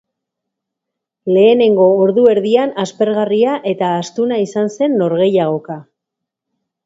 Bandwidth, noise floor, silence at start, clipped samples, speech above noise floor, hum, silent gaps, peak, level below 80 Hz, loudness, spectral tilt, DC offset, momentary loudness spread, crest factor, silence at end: 7.8 kHz; -80 dBFS; 1.25 s; under 0.1%; 67 dB; none; none; 0 dBFS; -64 dBFS; -14 LUFS; -6.5 dB/octave; under 0.1%; 9 LU; 14 dB; 1.05 s